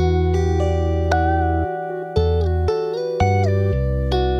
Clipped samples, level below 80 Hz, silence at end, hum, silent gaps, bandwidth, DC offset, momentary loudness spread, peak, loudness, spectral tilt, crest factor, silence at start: under 0.1%; -26 dBFS; 0 s; none; none; 7.4 kHz; under 0.1%; 5 LU; -6 dBFS; -20 LUFS; -7.5 dB/octave; 14 dB; 0 s